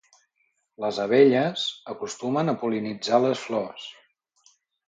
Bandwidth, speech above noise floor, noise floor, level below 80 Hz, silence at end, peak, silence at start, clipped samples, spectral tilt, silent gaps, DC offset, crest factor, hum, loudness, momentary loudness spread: 9 kHz; 49 dB; -73 dBFS; -74 dBFS; 0.95 s; -6 dBFS; 0.8 s; under 0.1%; -5.5 dB/octave; none; under 0.1%; 20 dB; none; -24 LUFS; 16 LU